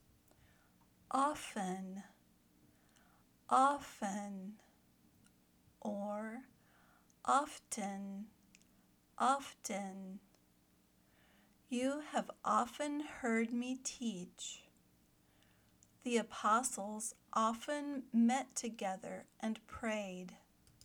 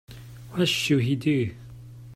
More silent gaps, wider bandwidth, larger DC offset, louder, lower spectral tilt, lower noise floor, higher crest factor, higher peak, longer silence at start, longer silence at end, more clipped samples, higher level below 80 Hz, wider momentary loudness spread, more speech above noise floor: neither; first, over 20 kHz vs 16 kHz; neither; second, -39 LUFS vs -25 LUFS; about the same, -4 dB/octave vs -5 dB/octave; first, -72 dBFS vs -43 dBFS; first, 22 dB vs 16 dB; second, -18 dBFS vs -10 dBFS; first, 1.1 s vs 0.1 s; first, 0.5 s vs 0 s; neither; second, -76 dBFS vs -56 dBFS; second, 15 LU vs 22 LU; first, 33 dB vs 19 dB